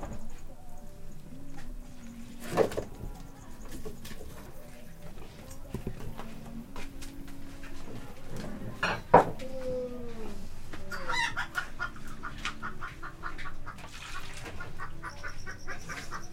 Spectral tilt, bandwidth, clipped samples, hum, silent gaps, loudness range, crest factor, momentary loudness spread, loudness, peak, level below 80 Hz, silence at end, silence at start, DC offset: -4.5 dB/octave; 15.5 kHz; under 0.1%; none; none; 14 LU; 30 dB; 18 LU; -35 LUFS; -4 dBFS; -42 dBFS; 0 s; 0 s; under 0.1%